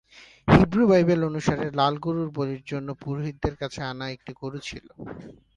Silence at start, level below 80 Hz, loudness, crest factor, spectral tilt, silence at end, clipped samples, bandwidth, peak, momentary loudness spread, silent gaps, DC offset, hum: 0.15 s; -44 dBFS; -24 LUFS; 22 dB; -7 dB/octave; 0.25 s; under 0.1%; 9.8 kHz; -2 dBFS; 19 LU; none; under 0.1%; none